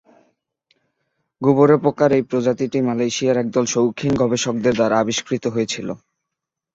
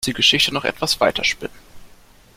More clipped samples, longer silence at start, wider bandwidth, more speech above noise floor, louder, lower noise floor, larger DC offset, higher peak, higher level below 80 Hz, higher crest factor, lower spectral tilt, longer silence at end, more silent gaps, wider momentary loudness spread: neither; first, 1.4 s vs 0 s; second, 8 kHz vs 16.5 kHz; first, 65 dB vs 28 dB; about the same, -18 LUFS vs -17 LUFS; first, -83 dBFS vs -48 dBFS; neither; about the same, -2 dBFS vs -2 dBFS; second, -54 dBFS vs -46 dBFS; about the same, 18 dB vs 20 dB; first, -5 dB/octave vs -2 dB/octave; first, 0.8 s vs 0.5 s; neither; second, 8 LU vs 12 LU